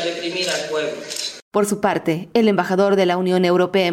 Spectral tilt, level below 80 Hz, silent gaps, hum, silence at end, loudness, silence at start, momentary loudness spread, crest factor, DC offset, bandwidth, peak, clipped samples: -4.5 dB/octave; -62 dBFS; 1.42-1.51 s; none; 0 s; -19 LUFS; 0 s; 8 LU; 14 dB; under 0.1%; 16.5 kHz; -4 dBFS; under 0.1%